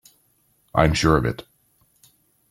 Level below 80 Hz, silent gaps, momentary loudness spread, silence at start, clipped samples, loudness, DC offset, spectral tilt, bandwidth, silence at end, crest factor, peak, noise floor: -38 dBFS; none; 11 LU; 0.75 s; under 0.1%; -20 LUFS; under 0.1%; -5.5 dB/octave; 15.5 kHz; 1.1 s; 22 dB; -2 dBFS; -64 dBFS